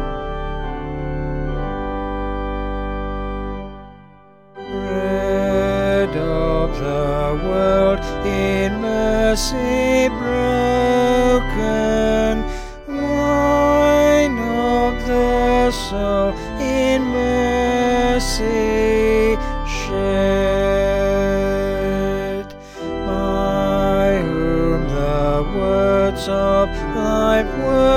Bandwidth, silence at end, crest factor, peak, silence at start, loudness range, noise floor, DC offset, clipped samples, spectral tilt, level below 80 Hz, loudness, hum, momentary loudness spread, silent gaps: 16 kHz; 0 s; 14 dB; -4 dBFS; 0 s; 8 LU; -46 dBFS; under 0.1%; under 0.1%; -5.5 dB/octave; -28 dBFS; -18 LUFS; none; 10 LU; none